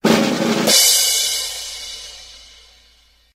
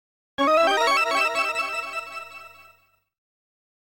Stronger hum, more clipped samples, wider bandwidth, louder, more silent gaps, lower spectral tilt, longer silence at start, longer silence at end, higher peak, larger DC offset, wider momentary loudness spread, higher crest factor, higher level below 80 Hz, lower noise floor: second, none vs 50 Hz at -70 dBFS; neither; about the same, 16 kHz vs 17 kHz; first, -14 LUFS vs -22 LUFS; neither; about the same, -1.5 dB/octave vs -1 dB/octave; second, 0.05 s vs 0.4 s; second, 0.95 s vs 1.5 s; first, 0 dBFS vs -10 dBFS; neither; about the same, 21 LU vs 19 LU; about the same, 18 dB vs 14 dB; first, -52 dBFS vs -68 dBFS; second, -54 dBFS vs -60 dBFS